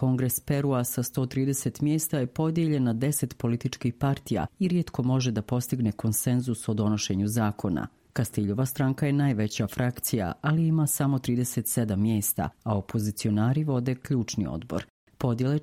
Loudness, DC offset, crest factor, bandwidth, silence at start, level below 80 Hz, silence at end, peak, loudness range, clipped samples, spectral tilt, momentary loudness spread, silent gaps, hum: -27 LUFS; under 0.1%; 16 dB; 16.5 kHz; 0 s; -54 dBFS; 0 s; -10 dBFS; 2 LU; under 0.1%; -6 dB/octave; 5 LU; 14.90-15.07 s; none